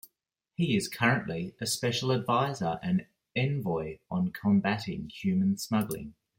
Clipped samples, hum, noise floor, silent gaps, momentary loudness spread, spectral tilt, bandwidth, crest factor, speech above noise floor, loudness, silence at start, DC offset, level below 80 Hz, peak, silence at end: under 0.1%; none; -83 dBFS; none; 9 LU; -5.5 dB/octave; 16.5 kHz; 18 dB; 54 dB; -30 LUFS; 0.6 s; under 0.1%; -62 dBFS; -12 dBFS; 0.25 s